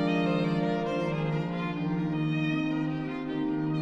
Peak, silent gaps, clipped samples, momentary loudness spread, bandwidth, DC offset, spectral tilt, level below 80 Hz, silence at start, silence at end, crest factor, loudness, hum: -16 dBFS; none; under 0.1%; 5 LU; 8 kHz; under 0.1%; -8 dB/octave; -56 dBFS; 0 s; 0 s; 12 dB; -29 LUFS; none